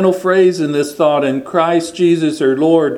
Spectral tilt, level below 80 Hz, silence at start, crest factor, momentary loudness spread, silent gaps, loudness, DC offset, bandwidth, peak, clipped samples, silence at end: -6 dB/octave; -60 dBFS; 0 s; 14 dB; 4 LU; none; -14 LUFS; under 0.1%; 15 kHz; 0 dBFS; under 0.1%; 0 s